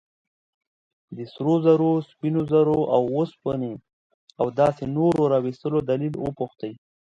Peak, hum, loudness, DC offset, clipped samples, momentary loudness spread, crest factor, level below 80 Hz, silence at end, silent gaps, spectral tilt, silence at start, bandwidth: -6 dBFS; none; -23 LUFS; under 0.1%; under 0.1%; 15 LU; 18 dB; -58 dBFS; 0.45 s; 3.93-4.27 s; -9 dB/octave; 1.1 s; 9.6 kHz